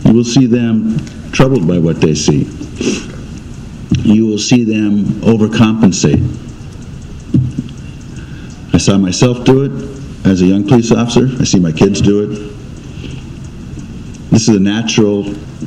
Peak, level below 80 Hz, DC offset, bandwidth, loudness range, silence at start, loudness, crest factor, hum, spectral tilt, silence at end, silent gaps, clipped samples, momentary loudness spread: 0 dBFS; -32 dBFS; under 0.1%; 10 kHz; 4 LU; 0 s; -12 LUFS; 12 dB; none; -6 dB/octave; 0 s; none; 0.4%; 19 LU